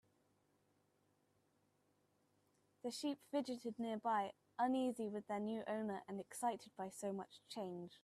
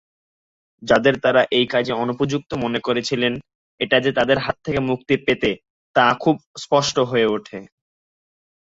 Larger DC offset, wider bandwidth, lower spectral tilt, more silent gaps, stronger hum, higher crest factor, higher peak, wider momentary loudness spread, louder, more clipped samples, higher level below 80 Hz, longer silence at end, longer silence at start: neither; first, 14.5 kHz vs 8 kHz; about the same, -5 dB/octave vs -5 dB/octave; second, none vs 3.55-3.78 s, 5.70-5.94 s, 6.46-6.54 s; first, 50 Hz at -75 dBFS vs none; about the same, 18 dB vs 18 dB; second, -28 dBFS vs -2 dBFS; about the same, 9 LU vs 9 LU; second, -44 LUFS vs -20 LUFS; neither; second, -90 dBFS vs -52 dBFS; second, 0.05 s vs 1.1 s; first, 2.85 s vs 0.8 s